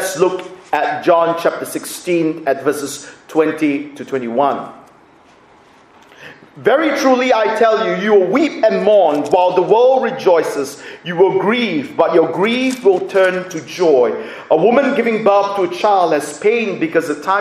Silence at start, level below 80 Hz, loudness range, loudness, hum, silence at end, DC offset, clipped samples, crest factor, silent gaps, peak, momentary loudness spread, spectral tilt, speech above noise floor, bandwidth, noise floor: 0 s; -64 dBFS; 7 LU; -15 LUFS; none; 0 s; under 0.1%; under 0.1%; 14 dB; none; 0 dBFS; 11 LU; -4.5 dB/octave; 32 dB; 15.5 kHz; -47 dBFS